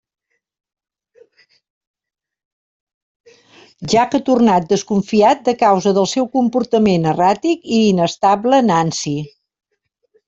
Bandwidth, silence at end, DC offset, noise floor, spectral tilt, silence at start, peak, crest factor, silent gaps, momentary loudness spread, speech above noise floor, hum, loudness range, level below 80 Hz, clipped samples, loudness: 8 kHz; 1 s; under 0.1%; -70 dBFS; -5.5 dB/octave; 3.8 s; 0 dBFS; 16 dB; none; 6 LU; 55 dB; none; 5 LU; -56 dBFS; under 0.1%; -15 LUFS